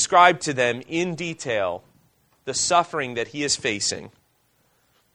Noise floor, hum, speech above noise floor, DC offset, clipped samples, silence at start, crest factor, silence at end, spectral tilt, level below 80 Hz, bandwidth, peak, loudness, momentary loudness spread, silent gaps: -65 dBFS; none; 43 dB; under 0.1%; under 0.1%; 0 s; 24 dB; 1.05 s; -2.5 dB/octave; -62 dBFS; 11 kHz; 0 dBFS; -22 LUFS; 12 LU; none